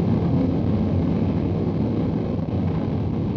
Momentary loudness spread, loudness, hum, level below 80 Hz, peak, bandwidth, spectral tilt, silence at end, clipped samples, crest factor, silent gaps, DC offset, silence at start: 3 LU; -23 LUFS; none; -38 dBFS; -10 dBFS; 6.2 kHz; -10.5 dB/octave; 0 s; under 0.1%; 12 dB; none; under 0.1%; 0 s